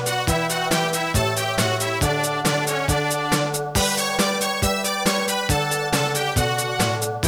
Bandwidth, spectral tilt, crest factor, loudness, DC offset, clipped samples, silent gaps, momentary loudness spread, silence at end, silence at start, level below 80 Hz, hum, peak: over 20 kHz; -3.5 dB/octave; 16 dB; -21 LUFS; under 0.1%; under 0.1%; none; 1 LU; 0 s; 0 s; -36 dBFS; none; -6 dBFS